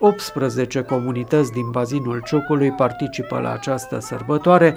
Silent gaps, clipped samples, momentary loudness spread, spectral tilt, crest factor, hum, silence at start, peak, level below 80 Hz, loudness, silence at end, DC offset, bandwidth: none; under 0.1%; 7 LU; -6.5 dB/octave; 18 dB; none; 0 s; 0 dBFS; -54 dBFS; -21 LUFS; 0 s; under 0.1%; over 20 kHz